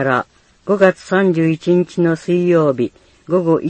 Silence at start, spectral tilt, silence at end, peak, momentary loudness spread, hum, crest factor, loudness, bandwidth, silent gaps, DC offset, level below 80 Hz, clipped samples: 0 s; -7.5 dB/octave; 0 s; 0 dBFS; 8 LU; none; 16 dB; -16 LUFS; 8.6 kHz; none; under 0.1%; -56 dBFS; under 0.1%